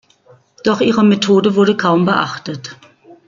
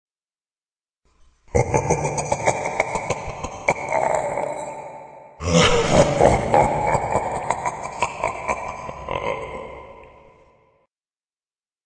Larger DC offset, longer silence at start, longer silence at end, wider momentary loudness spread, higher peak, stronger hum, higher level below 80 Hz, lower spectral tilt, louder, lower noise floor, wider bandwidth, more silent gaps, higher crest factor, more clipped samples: neither; second, 0.65 s vs 1.55 s; second, 0.15 s vs 1.75 s; about the same, 15 LU vs 17 LU; about the same, -2 dBFS vs -2 dBFS; neither; second, -58 dBFS vs -40 dBFS; first, -6 dB/octave vs -4.5 dB/octave; first, -14 LUFS vs -21 LUFS; second, -49 dBFS vs under -90 dBFS; second, 7.6 kHz vs 10.5 kHz; neither; second, 14 dB vs 22 dB; neither